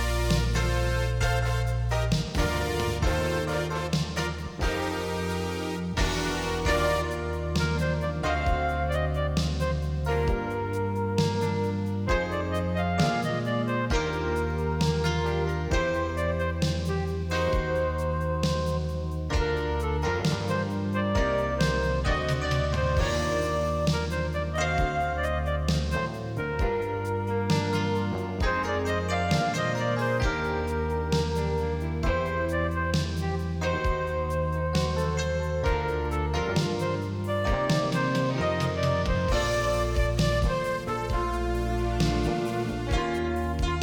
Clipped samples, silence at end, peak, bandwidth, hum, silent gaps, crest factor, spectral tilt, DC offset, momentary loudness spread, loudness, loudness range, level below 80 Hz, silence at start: under 0.1%; 0 s; -10 dBFS; 20 kHz; none; none; 16 dB; -6 dB/octave; under 0.1%; 4 LU; -27 LUFS; 2 LU; -34 dBFS; 0 s